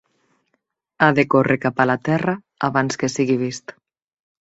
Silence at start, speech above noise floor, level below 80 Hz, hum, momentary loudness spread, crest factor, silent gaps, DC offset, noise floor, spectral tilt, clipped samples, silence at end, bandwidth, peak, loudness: 1 s; 54 dB; -60 dBFS; none; 9 LU; 20 dB; none; under 0.1%; -72 dBFS; -6 dB/octave; under 0.1%; 0.75 s; 8 kHz; -2 dBFS; -19 LUFS